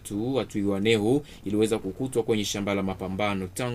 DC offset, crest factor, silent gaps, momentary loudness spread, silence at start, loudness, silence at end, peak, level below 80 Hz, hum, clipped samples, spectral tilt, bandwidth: under 0.1%; 18 dB; none; 6 LU; 0 s; -27 LUFS; 0 s; -8 dBFS; -52 dBFS; none; under 0.1%; -5 dB/octave; 15.5 kHz